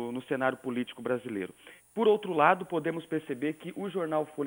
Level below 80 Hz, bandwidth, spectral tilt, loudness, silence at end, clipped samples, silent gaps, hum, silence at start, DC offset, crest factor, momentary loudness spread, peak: -76 dBFS; over 20 kHz; -6.5 dB/octave; -30 LUFS; 0 s; under 0.1%; none; none; 0 s; under 0.1%; 24 dB; 13 LU; -8 dBFS